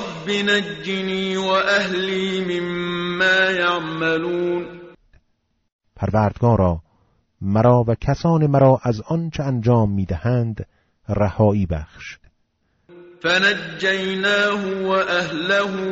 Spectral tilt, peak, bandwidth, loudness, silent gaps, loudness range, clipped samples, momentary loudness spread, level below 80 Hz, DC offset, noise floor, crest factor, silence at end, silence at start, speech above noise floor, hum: -4.5 dB/octave; -2 dBFS; 8 kHz; -19 LUFS; 5.72-5.79 s; 4 LU; under 0.1%; 10 LU; -42 dBFS; under 0.1%; -68 dBFS; 18 dB; 0 s; 0 s; 49 dB; none